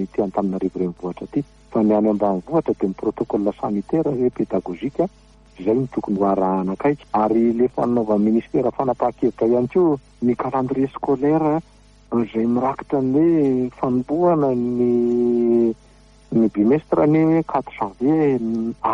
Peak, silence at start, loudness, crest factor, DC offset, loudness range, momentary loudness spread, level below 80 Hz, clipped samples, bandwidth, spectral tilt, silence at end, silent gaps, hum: -6 dBFS; 0 s; -20 LUFS; 12 dB; under 0.1%; 3 LU; 7 LU; -50 dBFS; under 0.1%; 7.2 kHz; -10 dB/octave; 0 s; none; none